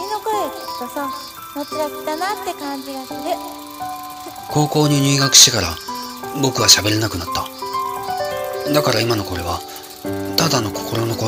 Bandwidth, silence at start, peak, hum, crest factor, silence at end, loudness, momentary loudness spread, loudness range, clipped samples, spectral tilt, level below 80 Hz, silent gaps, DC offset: 17.5 kHz; 0 s; 0 dBFS; none; 20 dB; 0 s; -17 LUFS; 18 LU; 12 LU; under 0.1%; -3 dB/octave; -48 dBFS; none; under 0.1%